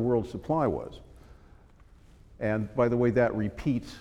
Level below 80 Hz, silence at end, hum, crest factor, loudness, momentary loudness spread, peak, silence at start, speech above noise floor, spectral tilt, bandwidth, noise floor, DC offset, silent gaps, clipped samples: -50 dBFS; 0 s; none; 18 dB; -28 LUFS; 9 LU; -12 dBFS; 0 s; 27 dB; -8.5 dB/octave; 11 kHz; -55 dBFS; under 0.1%; none; under 0.1%